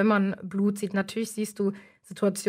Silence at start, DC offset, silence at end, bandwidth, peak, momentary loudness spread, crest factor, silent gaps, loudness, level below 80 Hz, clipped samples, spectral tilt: 0 s; under 0.1%; 0 s; 16 kHz; -12 dBFS; 6 LU; 14 dB; none; -28 LUFS; -72 dBFS; under 0.1%; -6 dB/octave